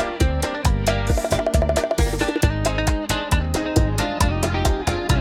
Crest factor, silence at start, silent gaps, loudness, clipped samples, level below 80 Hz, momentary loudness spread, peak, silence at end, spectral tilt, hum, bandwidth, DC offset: 16 dB; 0 s; none; -21 LUFS; under 0.1%; -26 dBFS; 2 LU; -4 dBFS; 0 s; -5 dB/octave; none; 17 kHz; under 0.1%